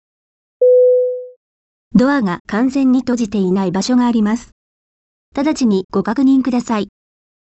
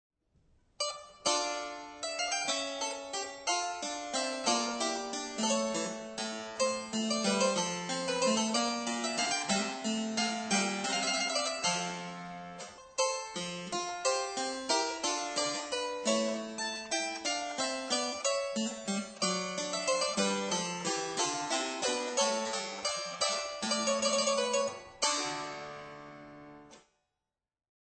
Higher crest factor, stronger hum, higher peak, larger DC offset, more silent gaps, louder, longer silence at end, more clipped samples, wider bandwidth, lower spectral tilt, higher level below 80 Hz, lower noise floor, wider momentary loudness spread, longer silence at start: about the same, 16 dB vs 20 dB; neither; first, 0 dBFS vs -14 dBFS; neither; first, 1.36-1.91 s, 2.40-2.45 s, 4.52-5.32 s, 5.84-5.89 s vs none; first, -15 LUFS vs -32 LUFS; second, 0.6 s vs 1.2 s; neither; about the same, 8.4 kHz vs 9.2 kHz; first, -6.5 dB/octave vs -2 dB/octave; first, -50 dBFS vs -72 dBFS; about the same, under -90 dBFS vs -89 dBFS; about the same, 9 LU vs 8 LU; second, 0.6 s vs 0.8 s